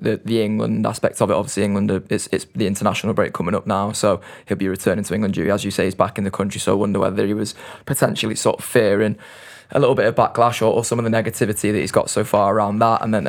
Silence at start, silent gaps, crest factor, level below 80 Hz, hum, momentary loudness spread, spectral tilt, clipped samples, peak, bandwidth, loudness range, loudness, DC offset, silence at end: 0 s; none; 18 dB; -54 dBFS; none; 6 LU; -5 dB/octave; under 0.1%; 0 dBFS; 18.5 kHz; 3 LU; -19 LUFS; under 0.1%; 0 s